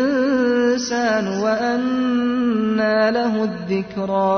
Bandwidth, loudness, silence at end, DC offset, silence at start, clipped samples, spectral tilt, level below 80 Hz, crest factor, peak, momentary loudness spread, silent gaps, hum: 6.6 kHz; -19 LUFS; 0 s; under 0.1%; 0 s; under 0.1%; -5.5 dB/octave; -56 dBFS; 12 dB; -6 dBFS; 6 LU; none; none